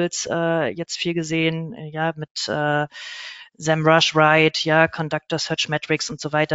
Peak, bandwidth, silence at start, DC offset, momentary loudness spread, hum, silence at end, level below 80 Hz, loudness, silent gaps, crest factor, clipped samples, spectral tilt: -2 dBFS; 8 kHz; 0 s; under 0.1%; 14 LU; none; 0 s; -62 dBFS; -20 LUFS; 2.31-2.35 s; 20 dB; under 0.1%; -3 dB/octave